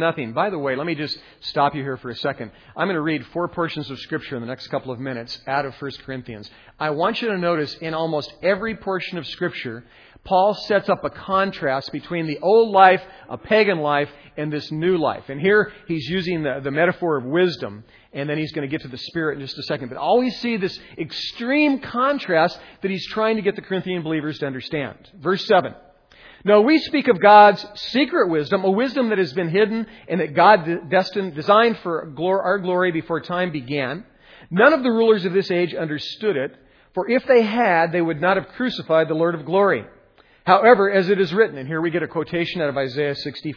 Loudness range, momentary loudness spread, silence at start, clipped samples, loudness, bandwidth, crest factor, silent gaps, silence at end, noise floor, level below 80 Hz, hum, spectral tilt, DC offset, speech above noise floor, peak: 8 LU; 13 LU; 0 s; under 0.1%; -20 LUFS; 5.4 kHz; 20 dB; none; 0 s; -54 dBFS; -58 dBFS; none; -7 dB/octave; under 0.1%; 34 dB; 0 dBFS